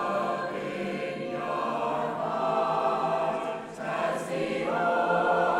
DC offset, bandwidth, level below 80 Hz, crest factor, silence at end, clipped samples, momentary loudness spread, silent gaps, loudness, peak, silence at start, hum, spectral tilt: under 0.1%; 13 kHz; -68 dBFS; 16 dB; 0 s; under 0.1%; 8 LU; none; -29 LUFS; -12 dBFS; 0 s; none; -5.5 dB/octave